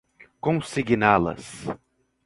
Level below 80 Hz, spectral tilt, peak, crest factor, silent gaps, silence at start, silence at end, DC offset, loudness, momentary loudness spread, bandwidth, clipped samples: -52 dBFS; -6 dB/octave; -2 dBFS; 24 dB; none; 0.45 s; 0.5 s; under 0.1%; -23 LUFS; 16 LU; 11.5 kHz; under 0.1%